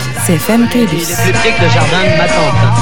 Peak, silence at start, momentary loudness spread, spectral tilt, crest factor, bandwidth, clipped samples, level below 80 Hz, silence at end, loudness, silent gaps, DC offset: 0 dBFS; 0 s; 3 LU; -5 dB/octave; 12 dB; 20 kHz; under 0.1%; -32 dBFS; 0 s; -10 LUFS; none; 10%